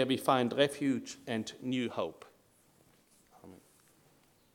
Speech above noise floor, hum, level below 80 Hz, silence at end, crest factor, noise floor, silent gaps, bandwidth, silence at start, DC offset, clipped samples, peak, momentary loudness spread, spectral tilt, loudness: 34 dB; none; -78 dBFS; 0.95 s; 24 dB; -67 dBFS; none; 18 kHz; 0 s; under 0.1%; under 0.1%; -12 dBFS; 10 LU; -5 dB/octave; -33 LUFS